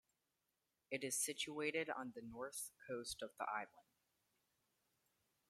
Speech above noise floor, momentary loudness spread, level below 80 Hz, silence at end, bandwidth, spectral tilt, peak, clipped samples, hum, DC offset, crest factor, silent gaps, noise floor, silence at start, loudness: 42 dB; 9 LU; -80 dBFS; 1.7 s; 16 kHz; -2 dB/octave; -28 dBFS; under 0.1%; none; under 0.1%; 22 dB; none; -89 dBFS; 0.9 s; -45 LUFS